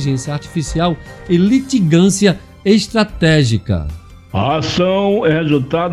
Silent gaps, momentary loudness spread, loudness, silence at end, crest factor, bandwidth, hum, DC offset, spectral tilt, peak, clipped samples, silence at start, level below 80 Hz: none; 9 LU; -15 LUFS; 0 s; 14 dB; 12.5 kHz; none; under 0.1%; -6 dB/octave; 0 dBFS; under 0.1%; 0 s; -34 dBFS